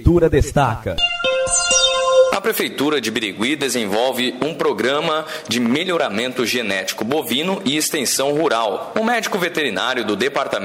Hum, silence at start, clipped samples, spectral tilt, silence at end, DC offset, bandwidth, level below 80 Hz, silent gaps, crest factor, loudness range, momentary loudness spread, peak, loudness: none; 0 s; under 0.1%; -3.5 dB/octave; 0 s; under 0.1%; 16 kHz; -36 dBFS; none; 18 dB; 3 LU; 6 LU; 0 dBFS; -18 LUFS